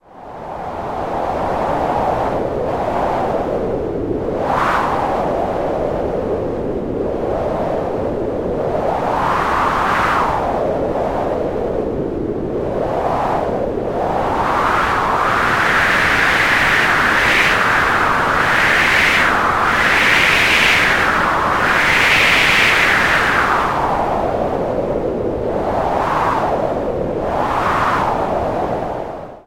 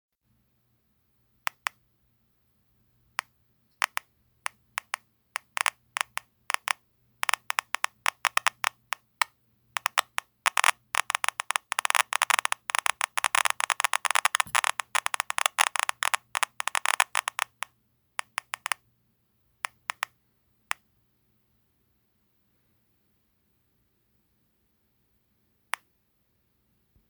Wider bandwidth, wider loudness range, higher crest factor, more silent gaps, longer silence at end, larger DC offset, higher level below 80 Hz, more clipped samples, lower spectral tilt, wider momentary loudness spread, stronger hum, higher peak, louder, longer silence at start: second, 16.5 kHz vs over 20 kHz; second, 8 LU vs 16 LU; second, 16 dB vs 32 dB; neither; second, 0.05 s vs 9.9 s; neither; first, -34 dBFS vs -78 dBFS; neither; first, -4 dB/octave vs 3 dB/octave; second, 10 LU vs 13 LU; neither; about the same, 0 dBFS vs 0 dBFS; first, -15 LUFS vs -28 LUFS; second, 0.15 s vs 3.8 s